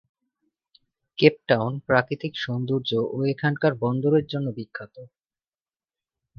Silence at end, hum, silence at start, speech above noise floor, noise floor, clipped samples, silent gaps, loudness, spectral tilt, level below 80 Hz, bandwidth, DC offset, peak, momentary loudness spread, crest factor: 1.3 s; none; 1.2 s; over 66 dB; under -90 dBFS; under 0.1%; none; -24 LUFS; -8 dB/octave; -64 dBFS; 6.8 kHz; under 0.1%; -2 dBFS; 15 LU; 24 dB